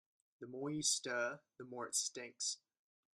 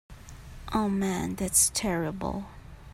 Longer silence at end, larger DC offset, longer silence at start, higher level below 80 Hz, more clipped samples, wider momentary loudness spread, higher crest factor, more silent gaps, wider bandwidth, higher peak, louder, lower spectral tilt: first, 0.6 s vs 0 s; neither; first, 0.4 s vs 0.1 s; second, -84 dBFS vs -46 dBFS; neither; second, 16 LU vs 23 LU; about the same, 22 dB vs 22 dB; neither; about the same, 15.5 kHz vs 16 kHz; second, -22 dBFS vs -8 dBFS; second, -40 LUFS vs -27 LUFS; second, -1.5 dB/octave vs -3.5 dB/octave